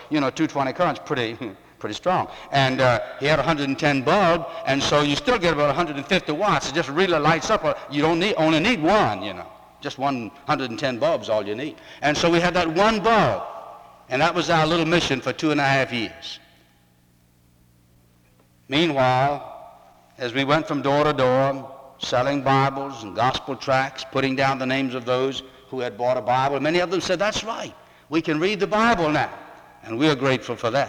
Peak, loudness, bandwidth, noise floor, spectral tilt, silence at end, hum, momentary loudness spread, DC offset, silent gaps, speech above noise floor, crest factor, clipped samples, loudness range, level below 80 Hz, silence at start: -4 dBFS; -22 LUFS; 18 kHz; -58 dBFS; -5 dB/octave; 0 s; none; 13 LU; under 0.1%; none; 37 dB; 18 dB; under 0.1%; 5 LU; -50 dBFS; 0 s